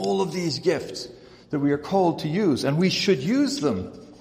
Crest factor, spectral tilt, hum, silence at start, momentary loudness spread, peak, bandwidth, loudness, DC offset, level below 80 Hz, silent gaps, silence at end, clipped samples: 16 dB; -5.5 dB/octave; none; 0 s; 11 LU; -8 dBFS; 15.5 kHz; -23 LUFS; under 0.1%; -60 dBFS; none; 0.05 s; under 0.1%